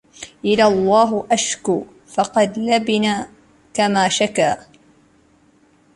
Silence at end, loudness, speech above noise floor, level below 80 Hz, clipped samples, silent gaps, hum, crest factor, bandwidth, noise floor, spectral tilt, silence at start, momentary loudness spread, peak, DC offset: 1.35 s; -18 LUFS; 38 dB; -56 dBFS; under 0.1%; none; none; 16 dB; 11.5 kHz; -55 dBFS; -3.5 dB/octave; 0.2 s; 11 LU; -2 dBFS; under 0.1%